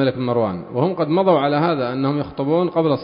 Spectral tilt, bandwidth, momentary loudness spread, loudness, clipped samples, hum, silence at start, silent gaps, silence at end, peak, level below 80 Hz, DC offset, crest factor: -12.5 dB/octave; 5.4 kHz; 6 LU; -19 LUFS; under 0.1%; none; 0 s; none; 0 s; -4 dBFS; -54 dBFS; under 0.1%; 14 dB